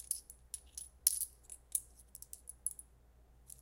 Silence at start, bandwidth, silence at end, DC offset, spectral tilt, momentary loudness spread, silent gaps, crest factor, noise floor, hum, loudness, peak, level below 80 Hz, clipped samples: 0 s; 17 kHz; 0.1 s; under 0.1%; 1 dB/octave; 21 LU; none; 36 dB; -64 dBFS; none; -39 LUFS; -8 dBFS; -64 dBFS; under 0.1%